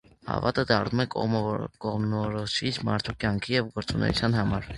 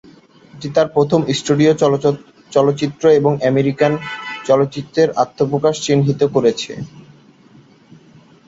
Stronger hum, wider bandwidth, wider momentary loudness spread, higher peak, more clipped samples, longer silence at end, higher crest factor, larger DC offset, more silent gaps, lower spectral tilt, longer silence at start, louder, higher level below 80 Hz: neither; first, 11.5 kHz vs 8 kHz; second, 6 LU vs 12 LU; second, -6 dBFS vs -2 dBFS; neither; second, 0 s vs 1.45 s; first, 22 dB vs 16 dB; neither; neither; about the same, -6 dB/octave vs -6 dB/octave; second, 0.25 s vs 0.55 s; second, -27 LUFS vs -16 LUFS; first, -46 dBFS vs -56 dBFS